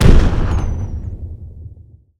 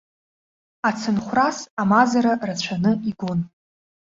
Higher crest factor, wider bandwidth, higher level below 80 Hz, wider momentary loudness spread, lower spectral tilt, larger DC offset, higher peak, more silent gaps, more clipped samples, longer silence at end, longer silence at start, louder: second, 14 dB vs 20 dB; first, 9.4 kHz vs 7.8 kHz; first, -16 dBFS vs -58 dBFS; first, 21 LU vs 9 LU; first, -7 dB/octave vs -5.5 dB/octave; neither; about the same, 0 dBFS vs -2 dBFS; second, none vs 1.70-1.77 s; first, 0.7% vs under 0.1%; second, 0.5 s vs 0.7 s; second, 0 s vs 0.85 s; about the same, -19 LUFS vs -21 LUFS